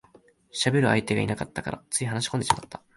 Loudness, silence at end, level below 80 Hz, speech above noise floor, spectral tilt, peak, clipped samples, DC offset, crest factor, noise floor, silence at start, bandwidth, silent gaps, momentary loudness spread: -26 LUFS; 0.2 s; -54 dBFS; 31 dB; -4.5 dB/octave; -4 dBFS; under 0.1%; under 0.1%; 24 dB; -58 dBFS; 0.55 s; 11.5 kHz; none; 10 LU